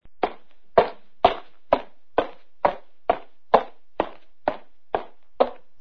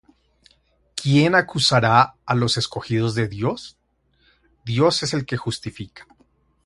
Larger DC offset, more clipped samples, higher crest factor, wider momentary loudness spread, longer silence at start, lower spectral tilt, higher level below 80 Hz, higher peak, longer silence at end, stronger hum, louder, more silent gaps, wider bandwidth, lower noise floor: first, 1% vs under 0.1%; neither; about the same, 26 dB vs 22 dB; second, 9 LU vs 18 LU; second, 0 s vs 0.95 s; first, -6.5 dB/octave vs -5 dB/octave; about the same, -52 dBFS vs -52 dBFS; about the same, 0 dBFS vs 0 dBFS; second, 0.25 s vs 0.65 s; neither; second, -26 LUFS vs -20 LUFS; neither; second, 6.2 kHz vs 11.5 kHz; second, -45 dBFS vs -64 dBFS